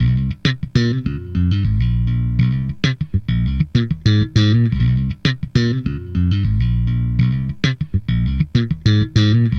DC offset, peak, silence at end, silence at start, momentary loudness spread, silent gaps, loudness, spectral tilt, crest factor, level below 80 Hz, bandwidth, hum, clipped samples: under 0.1%; 0 dBFS; 0 s; 0 s; 6 LU; none; -18 LUFS; -7 dB/octave; 16 dB; -26 dBFS; 6.6 kHz; none; under 0.1%